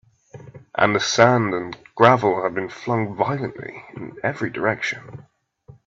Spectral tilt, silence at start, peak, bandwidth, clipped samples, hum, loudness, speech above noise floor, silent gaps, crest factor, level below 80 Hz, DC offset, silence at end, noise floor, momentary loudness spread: -5 dB/octave; 0.35 s; 0 dBFS; 7.8 kHz; under 0.1%; none; -20 LUFS; 29 dB; none; 22 dB; -60 dBFS; under 0.1%; 0.65 s; -50 dBFS; 18 LU